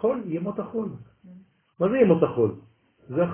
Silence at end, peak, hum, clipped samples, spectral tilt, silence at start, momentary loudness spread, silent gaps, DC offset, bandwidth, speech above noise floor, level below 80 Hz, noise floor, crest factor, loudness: 0 s; -6 dBFS; none; under 0.1%; -12 dB/octave; 0 s; 15 LU; none; under 0.1%; 3.5 kHz; 28 dB; -60 dBFS; -51 dBFS; 20 dB; -25 LUFS